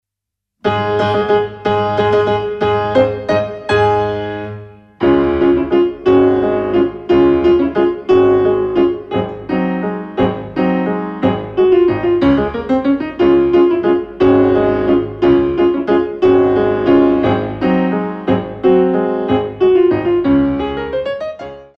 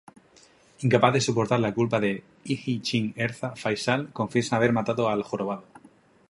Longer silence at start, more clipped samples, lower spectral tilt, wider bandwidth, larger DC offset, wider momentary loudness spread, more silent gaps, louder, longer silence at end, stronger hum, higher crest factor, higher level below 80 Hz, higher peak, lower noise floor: second, 0.65 s vs 0.8 s; neither; first, -8.5 dB/octave vs -5.5 dB/octave; second, 6 kHz vs 11.5 kHz; neither; about the same, 8 LU vs 10 LU; neither; first, -14 LUFS vs -26 LUFS; second, 0.1 s vs 0.7 s; neither; second, 12 dB vs 22 dB; first, -38 dBFS vs -62 dBFS; first, 0 dBFS vs -4 dBFS; first, -81 dBFS vs -57 dBFS